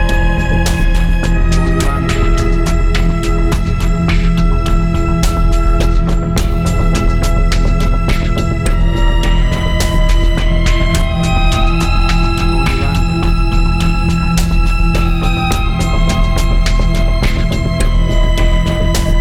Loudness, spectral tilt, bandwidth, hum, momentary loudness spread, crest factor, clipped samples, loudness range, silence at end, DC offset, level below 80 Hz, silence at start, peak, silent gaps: -14 LUFS; -5.5 dB/octave; 14 kHz; none; 1 LU; 10 dB; under 0.1%; 1 LU; 0 s; under 0.1%; -12 dBFS; 0 s; 0 dBFS; none